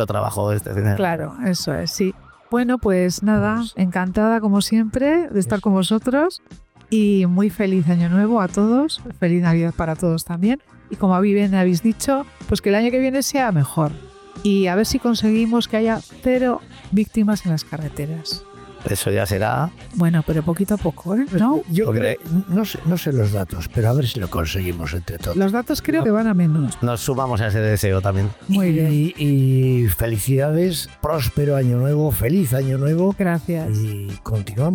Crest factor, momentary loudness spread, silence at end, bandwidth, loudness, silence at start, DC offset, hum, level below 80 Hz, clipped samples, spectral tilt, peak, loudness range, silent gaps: 10 dB; 7 LU; 0 s; 19 kHz; -19 LUFS; 0 s; under 0.1%; none; -40 dBFS; under 0.1%; -6.5 dB/octave; -10 dBFS; 3 LU; none